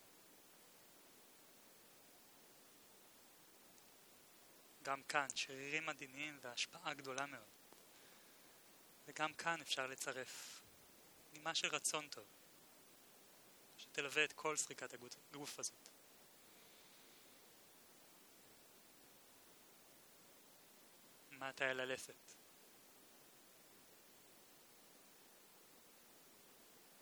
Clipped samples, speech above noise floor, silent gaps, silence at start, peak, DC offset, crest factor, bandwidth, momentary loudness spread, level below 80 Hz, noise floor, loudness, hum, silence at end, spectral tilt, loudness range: under 0.1%; 20 dB; none; 0 s; -22 dBFS; under 0.1%; 30 dB; over 20 kHz; 22 LU; under -90 dBFS; -66 dBFS; -44 LUFS; none; 0 s; -1 dB/octave; 19 LU